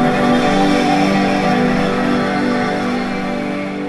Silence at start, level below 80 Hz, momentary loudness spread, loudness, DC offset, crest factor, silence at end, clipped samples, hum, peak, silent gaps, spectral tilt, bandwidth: 0 s; -38 dBFS; 7 LU; -16 LUFS; under 0.1%; 12 dB; 0 s; under 0.1%; none; -4 dBFS; none; -6 dB/octave; 12.5 kHz